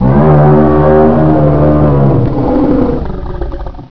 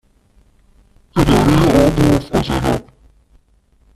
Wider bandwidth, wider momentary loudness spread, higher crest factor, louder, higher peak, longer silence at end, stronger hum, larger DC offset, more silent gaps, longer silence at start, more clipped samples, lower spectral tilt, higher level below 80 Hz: second, 5.4 kHz vs 14.5 kHz; first, 15 LU vs 9 LU; second, 8 dB vs 16 dB; first, -8 LUFS vs -14 LUFS; about the same, 0 dBFS vs 0 dBFS; second, 0 s vs 1.15 s; neither; first, 10% vs under 0.1%; neither; second, 0 s vs 1.15 s; neither; first, -12 dB/octave vs -6.5 dB/octave; first, -20 dBFS vs -28 dBFS